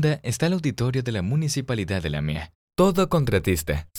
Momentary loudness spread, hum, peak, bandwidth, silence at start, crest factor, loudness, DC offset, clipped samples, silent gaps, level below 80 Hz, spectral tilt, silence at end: 7 LU; none; -6 dBFS; 18.5 kHz; 0 s; 18 dB; -24 LUFS; under 0.1%; under 0.1%; 2.55-2.68 s; -40 dBFS; -6 dB/octave; 0 s